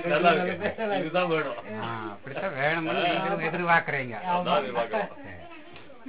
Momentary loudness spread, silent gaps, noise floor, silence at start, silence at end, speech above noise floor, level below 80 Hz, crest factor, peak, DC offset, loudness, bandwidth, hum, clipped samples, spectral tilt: 16 LU; none; -48 dBFS; 0 s; 0 s; 21 dB; -62 dBFS; 18 dB; -8 dBFS; 0.5%; -27 LUFS; 4 kHz; none; under 0.1%; -9 dB/octave